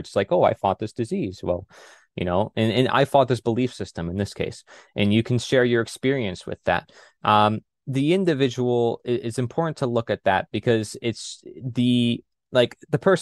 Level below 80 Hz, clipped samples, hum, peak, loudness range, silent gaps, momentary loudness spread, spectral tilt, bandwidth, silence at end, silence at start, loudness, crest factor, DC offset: -56 dBFS; under 0.1%; none; -4 dBFS; 2 LU; none; 10 LU; -6 dB/octave; 12.5 kHz; 0 s; 0 s; -23 LUFS; 20 dB; under 0.1%